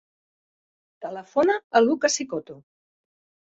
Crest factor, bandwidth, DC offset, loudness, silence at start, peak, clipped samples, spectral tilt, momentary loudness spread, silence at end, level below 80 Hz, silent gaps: 22 dB; 8.2 kHz; under 0.1%; -23 LUFS; 1 s; -4 dBFS; under 0.1%; -2.5 dB/octave; 16 LU; 0.85 s; -70 dBFS; 1.64-1.70 s